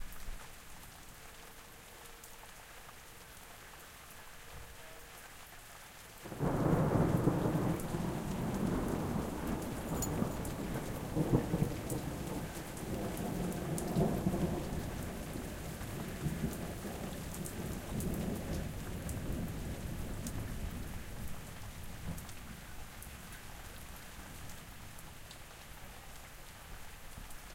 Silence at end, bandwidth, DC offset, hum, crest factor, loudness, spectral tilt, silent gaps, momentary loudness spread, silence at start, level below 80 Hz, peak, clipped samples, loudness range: 0 s; 17 kHz; under 0.1%; none; 24 dB; -39 LUFS; -6 dB/octave; none; 18 LU; 0 s; -48 dBFS; -16 dBFS; under 0.1%; 16 LU